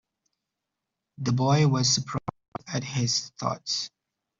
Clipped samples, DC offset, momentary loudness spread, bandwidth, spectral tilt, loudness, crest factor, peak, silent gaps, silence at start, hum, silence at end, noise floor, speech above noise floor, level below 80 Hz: under 0.1%; under 0.1%; 13 LU; 7.8 kHz; -4.5 dB/octave; -26 LUFS; 18 dB; -10 dBFS; 2.48-2.52 s; 1.2 s; none; 0.5 s; -85 dBFS; 60 dB; -62 dBFS